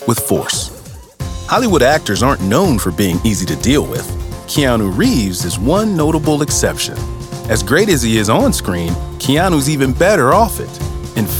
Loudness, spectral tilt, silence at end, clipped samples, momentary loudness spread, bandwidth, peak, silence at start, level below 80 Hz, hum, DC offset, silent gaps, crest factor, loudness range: -14 LUFS; -4.5 dB/octave; 0 s; under 0.1%; 12 LU; 19 kHz; 0 dBFS; 0 s; -28 dBFS; none; under 0.1%; none; 14 dB; 2 LU